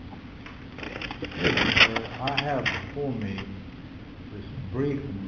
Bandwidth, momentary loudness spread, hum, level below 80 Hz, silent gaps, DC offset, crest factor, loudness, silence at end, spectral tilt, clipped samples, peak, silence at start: 7 kHz; 23 LU; none; -46 dBFS; none; under 0.1%; 26 dB; -25 LUFS; 0 s; -5 dB/octave; under 0.1%; -4 dBFS; 0 s